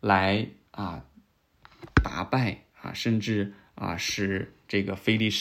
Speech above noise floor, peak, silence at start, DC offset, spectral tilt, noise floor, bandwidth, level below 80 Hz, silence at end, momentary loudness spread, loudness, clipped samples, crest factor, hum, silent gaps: 34 dB; -4 dBFS; 0.05 s; under 0.1%; -5 dB/octave; -61 dBFS; 16 kHz; -42 dBFS; 0 s; 12 LU; -28 LUFS; under 0.1%; 24 dB; none; none